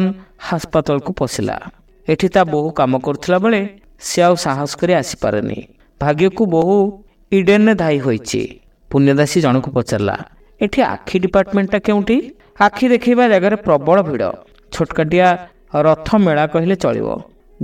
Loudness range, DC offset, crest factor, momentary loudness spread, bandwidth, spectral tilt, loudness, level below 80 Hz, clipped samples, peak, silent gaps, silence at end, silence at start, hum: 3 LU; under 0.1%; 16 dB; 10 LU; 16 kHz; -6 dB/octave; -16 LUFS; -44 dBFS; under 0.1%; 0 dBFS; none; 0 s; 0 s; none